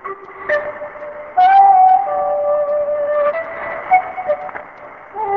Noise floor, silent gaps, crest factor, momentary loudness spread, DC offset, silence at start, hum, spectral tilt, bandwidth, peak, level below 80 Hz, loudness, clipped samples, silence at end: -36 dBFS; none; 16 dB; 21 LU; 0.1%; 0.05 s; none; -5.5 dB/octave; 5 kHz; 0 dBFS; -58 dBFS; -15 LUFS; under 0.1%; 0 s